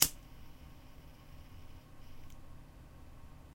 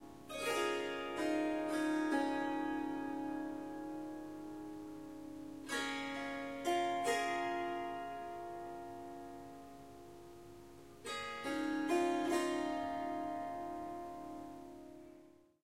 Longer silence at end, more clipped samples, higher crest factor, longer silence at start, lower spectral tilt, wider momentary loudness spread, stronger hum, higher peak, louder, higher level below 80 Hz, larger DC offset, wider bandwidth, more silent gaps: about the same, 0 s vs 0 s; neither; first, 40 dB vs 18 dB; about the same, 0 s vs 0 s; second, -1 dB/octave vs -3.5 dB/octave; second, 2 LU vs 19 LU; second, none vs 50 Hz at -70 dBFS; first, -4 dBFS vs -24 dBFS; first, -34 LUFS vs -40 LUFS; first, -54 dBFS vs -70 dBFS; neither; about the same, 16 kHz vs 16 kHz; neither